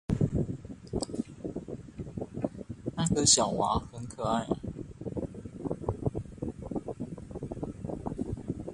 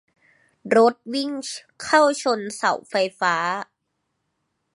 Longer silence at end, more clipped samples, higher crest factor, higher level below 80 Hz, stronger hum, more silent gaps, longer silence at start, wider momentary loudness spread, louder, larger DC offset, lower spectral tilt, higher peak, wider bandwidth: second, 0 s vs 1.1 s; neither; about the same, 24 dB vs 20 dB; first, -48 dBFS vs -72 dBFS; neither; neither; second, 0.1 s vs 0.65 s; about the same, 15 LU vs 13 LU; second, -32 LUFS vs -21 LUFS; neither; first, -4.5 dB/octave vs -3 dB/octave; second, -10 dBFS vs -2 dBFS; about the same, 11.5 kHz vs 11.5 kHz